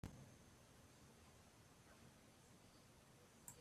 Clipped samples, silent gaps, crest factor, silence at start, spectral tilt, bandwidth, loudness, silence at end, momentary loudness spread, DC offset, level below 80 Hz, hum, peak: under 0.1%; none; 28 dB; 0.05 s; -4 dB/octave; 14.5 kHz; -66 LUFS; 0 s; 6 LU; under 0.1%; -76 dBFS; none; -36 dBFS